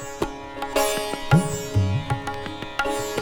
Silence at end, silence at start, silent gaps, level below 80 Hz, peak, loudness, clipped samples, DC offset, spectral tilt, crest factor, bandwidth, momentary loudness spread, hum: 0 s; 0 s; none; -42 dBFS; -4 dBFS; -25 LUFS; under 0.1%; under 0.1%; -5 dB/octave; 20 dB; 19 kHz; 10 LU; none